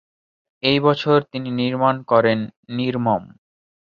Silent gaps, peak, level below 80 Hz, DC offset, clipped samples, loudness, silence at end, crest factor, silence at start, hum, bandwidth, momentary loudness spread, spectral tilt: 2.56-2.63 s; -2 dBFS; -60 dBFS; under 0.1%; under 0.1%; -20 LUFS; 0.7 s; 20 dB; 0.65 s; none; 7 kHz; 8 LU; -8 dB/octave